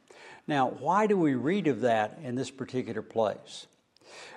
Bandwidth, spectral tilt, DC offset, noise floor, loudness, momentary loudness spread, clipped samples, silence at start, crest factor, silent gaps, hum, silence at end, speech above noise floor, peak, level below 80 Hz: 11 kHz; -6 dB/octave; under 0.1%; -52 dBFS; -29 LUFS; 17 LU; under 0.1%; 0.2 s; 18 dB; none; none; 0 s; 23 dB; -12 dBFS; -78 dBFS